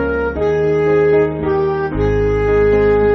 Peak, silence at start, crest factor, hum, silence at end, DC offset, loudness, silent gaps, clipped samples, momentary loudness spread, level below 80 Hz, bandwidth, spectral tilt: -4 dBFS; 0 s; 10 dB; none; 0 s; under 0.1%; -15 LUFS; none; under 0.1%; 5 LU; -28 dBFS; 6.2 kHz; -7 dB/octave